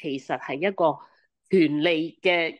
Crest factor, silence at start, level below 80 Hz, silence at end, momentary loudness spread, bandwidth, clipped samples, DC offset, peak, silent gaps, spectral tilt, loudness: 16 dB; 0 s; -74 dBFS; 0.05 s; 9 LU; 9.4 kHz; under 0.1%; under 0.1%; -8 dBFS; none; -6.5 dB/octave; -24 LUFS